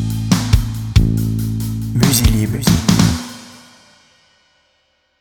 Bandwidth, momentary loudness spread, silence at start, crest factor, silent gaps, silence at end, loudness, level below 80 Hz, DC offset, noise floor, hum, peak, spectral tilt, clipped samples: over 20 kHz; 9 LU; 0 s; 16 dB; none; 1.65 s; -16 LUFS; -24 dBFS; under 0.1%; -62 dBFS; none; 0 dBFS; -5 dB/octave; under 0.1%